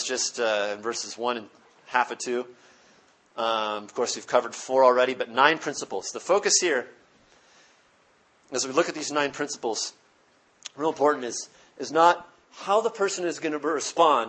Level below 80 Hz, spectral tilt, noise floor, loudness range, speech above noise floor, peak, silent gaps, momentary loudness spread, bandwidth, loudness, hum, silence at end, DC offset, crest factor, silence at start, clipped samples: -78 dBFS; -1.5 dB/octave; -62 dBFS; 7 LU; 37 dB; -2 dBFS; none; 12 LU; 8.8 kHz; -25 LUFS; none; 0 s; under 0.1%; 24 dB; 0 s; under 0.1%